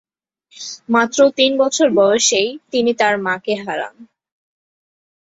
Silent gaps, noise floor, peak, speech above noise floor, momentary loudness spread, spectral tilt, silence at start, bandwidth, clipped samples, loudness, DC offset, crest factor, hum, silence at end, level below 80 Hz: none; -58 dBFS; 0 dBFS; 43 dB; 15 LU; -2 dB/octave; 0.6 s; 8 kHz; under 0.1%; -16 LUFS; under 0.1%; 18 dB; none; 1.35 s; -64 dBFS